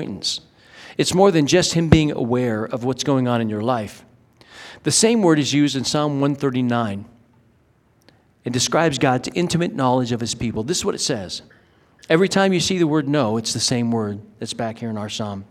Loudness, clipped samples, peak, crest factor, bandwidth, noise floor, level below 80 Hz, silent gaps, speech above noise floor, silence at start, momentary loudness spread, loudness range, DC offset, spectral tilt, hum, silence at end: -20 LUFS; under 0.1%; 0 dBFS; 20 dB; 16 kHz; -58 dBFS; -48 dBFS; none; 39 dB; 0 s; 12 LU; 4 LU; under 0.1%; -4.5 dB/octave; none; 0.05 s